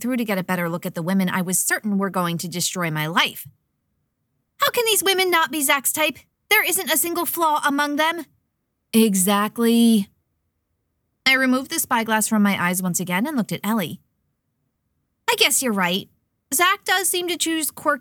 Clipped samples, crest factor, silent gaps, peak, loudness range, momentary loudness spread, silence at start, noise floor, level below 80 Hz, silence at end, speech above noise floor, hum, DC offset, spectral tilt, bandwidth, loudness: under 0.1%; 18 dB; none; -4 dBFS; 4 LU; 7 LU; 0 s; -74 dBFS; -68 dBFS; 0 s; 53 dB; none; under 0.1%; -3 dB/octave; 19 kHz; -20 LUFS